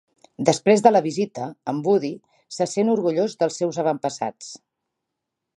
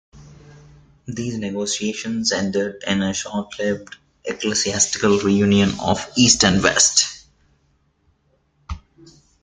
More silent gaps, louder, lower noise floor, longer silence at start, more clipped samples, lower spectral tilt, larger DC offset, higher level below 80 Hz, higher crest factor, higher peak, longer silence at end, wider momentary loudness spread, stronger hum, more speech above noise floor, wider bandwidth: neither; second, -22 LUFS vs -18 LUFS; first, -82 dBFS vs -63 dBFS; first, 0.4 s vs 0.15 s; neither; first, -5.5 dB/octave vs -3 dB/octave; neither; second, -72 dBFS vs -48 dBFS; about the same, 20 dB vs 22 dB; about the same, -2 dBFS vs 0 dBFS; first, 1 s vs 0.65 s; about the same, 15 LU vs 16 LU; neither; first, 61 dB vs 44 dB; first, 11.5 kHz vs 9.8 kHz